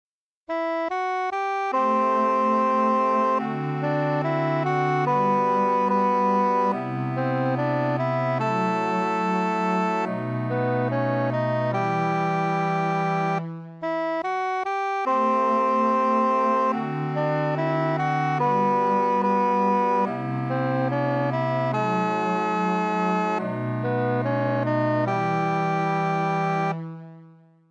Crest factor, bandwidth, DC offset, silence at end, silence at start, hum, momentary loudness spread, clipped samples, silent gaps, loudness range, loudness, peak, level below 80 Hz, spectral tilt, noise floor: 12 dB; 9.4 kHz; under 0.1%; 0.4 s; 0.5 s; none; 5 LU; under 0.1%; none; 2 LU; -23 LUFS; -10 dBFS; -76 dBFS; -7.5 dB/octave; -51 dBFS